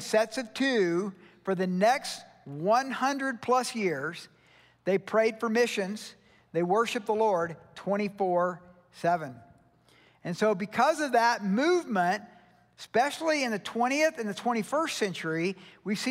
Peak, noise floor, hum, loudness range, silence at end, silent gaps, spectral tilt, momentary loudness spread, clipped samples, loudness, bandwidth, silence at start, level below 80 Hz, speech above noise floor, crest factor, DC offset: -12 dBFS; -61 dBFS; none; 3 LU; 0 s; none; -4.5 dB/octave; 12 LU; under 0.1%; -28 LUFS; 16 kHz; 0 s; -76 dBFS; 33 dB; 18 dB; under 0.1%